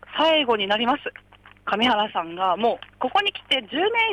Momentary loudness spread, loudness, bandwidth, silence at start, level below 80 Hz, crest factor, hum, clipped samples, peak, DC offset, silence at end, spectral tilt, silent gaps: 8 LU; -22 LUFS; 13.5 kHz; 0.1 s; -60 dBFS; 14 dB; 50 Hz at -55 dBFS; under 0.1%; -10 dBFS; under 0.1%; 0 s; -4 dB/octave; none